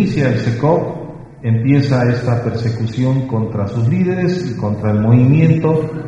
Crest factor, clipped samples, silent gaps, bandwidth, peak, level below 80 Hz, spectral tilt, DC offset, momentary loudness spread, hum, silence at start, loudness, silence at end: 14 dB; under 0.1%; none; 7.6 kHz; 0 dBFS; -44 dBFS; -9 dB/octave; under 0.1%; 8 LU; none; 0 s; -15 LUFS; 0 s